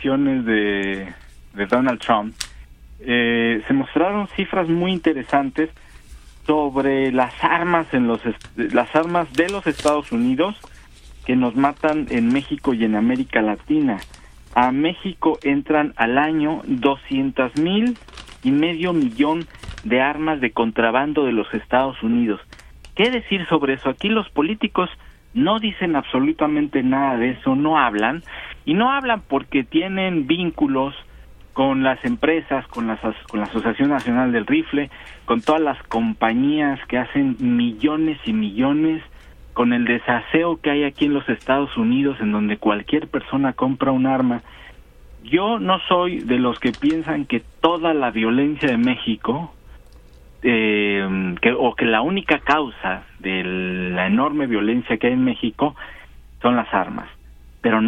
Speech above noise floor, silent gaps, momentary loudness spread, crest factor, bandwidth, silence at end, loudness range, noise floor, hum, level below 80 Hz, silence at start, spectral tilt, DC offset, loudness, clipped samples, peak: 25 dB; none; 7 LU; 20 dB; 11 kHz; 0 s; 2 LU; -45 dBFS; none; -46 dBFS; 0 s; -6.5 dB/octave; under 0.1%; -20 LUFS; under 0.1%; 0 dBFS